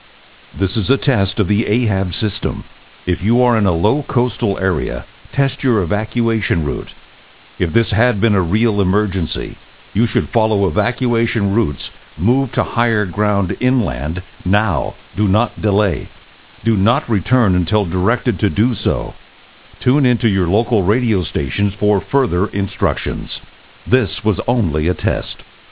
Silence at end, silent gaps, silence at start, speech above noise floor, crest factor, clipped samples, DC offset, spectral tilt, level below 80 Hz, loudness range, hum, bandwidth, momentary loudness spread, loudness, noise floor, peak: 0.25 s; none; 0.55 s; 29 dB; 16 dB; under 0.1%; 0.9%; -11.5 dB/octave; -32 dBFS; 2 LU; none; 4 kHz; 9 LU; -17 LUFS; -45 dBFS; 0 dBFS